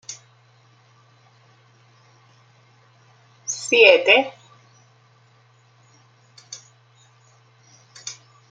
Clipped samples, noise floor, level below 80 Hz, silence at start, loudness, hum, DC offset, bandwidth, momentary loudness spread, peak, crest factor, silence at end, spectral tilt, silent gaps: under 0.1%; -56 dBFS; -80 dBFS; 0.1 s; -15 LUFS; none; under 0.1%; 9.2 kHz; 28 LU; 0 dBFS; 24 dB; 0.4 s; -1 dB/octave; none